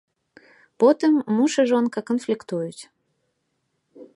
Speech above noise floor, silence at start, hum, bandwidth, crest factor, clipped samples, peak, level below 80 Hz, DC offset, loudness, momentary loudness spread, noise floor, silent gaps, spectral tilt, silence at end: 53 dB; 0.8 s; none; 11.5 kHz; 18 dB; under 0.1%; -4 dBFS; -78 dBFS; under 0.1%; -21 LUFS; 11 LU; -74 dBFS; none; -5.5 dB/octave; 0.1 s